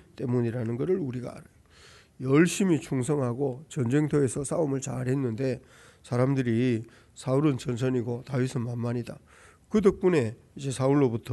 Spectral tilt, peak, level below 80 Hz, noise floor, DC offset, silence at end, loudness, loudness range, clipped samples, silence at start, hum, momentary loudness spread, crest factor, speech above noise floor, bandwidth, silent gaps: -7 dB/octave; -8 dBFS; -58 dBFS; -54 dBFS; under 0.1%; 0 s; -27 LUFS; 2 LU; under 0.1%; 0.2 s; none; 11 LU; 18 dB; 28 dB; 12 kHz; none